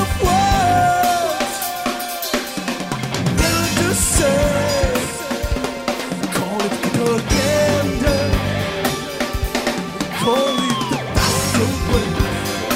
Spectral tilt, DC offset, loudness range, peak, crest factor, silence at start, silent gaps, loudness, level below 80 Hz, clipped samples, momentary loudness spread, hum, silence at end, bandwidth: -4 dB/octave; under 0.1%; 1 LU; -2 dBFS; 16 dB; 0 s; none; -18 LUFS; -30 dBFS; under 0.1%; 8 LU; none; 0 s; 16.5 kHz